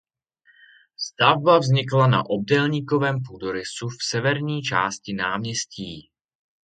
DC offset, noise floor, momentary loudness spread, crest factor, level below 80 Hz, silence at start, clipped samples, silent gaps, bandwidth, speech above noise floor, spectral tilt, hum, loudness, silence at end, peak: under 0.1%; -62 dBFS; 14 LU; 22 dB; -60 dBFS; 1 s; under 0.1%; none; 9.2 kHz; 40 dB; -5 dB/octave; none; -22 LUFS; 0.65 s; 0 dBFS